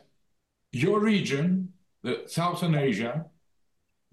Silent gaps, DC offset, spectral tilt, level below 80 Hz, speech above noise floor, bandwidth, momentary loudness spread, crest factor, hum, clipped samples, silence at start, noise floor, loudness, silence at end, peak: none; under 0.1%; -6.5 dB/octave; -68 dBFS; 51 dB; 12.5 kHz; 14 LU; 14 dB; none; under 0.1%; 0.75 s; -77 dBFS; -27 LUFS; 0.85 s; -16 dBFS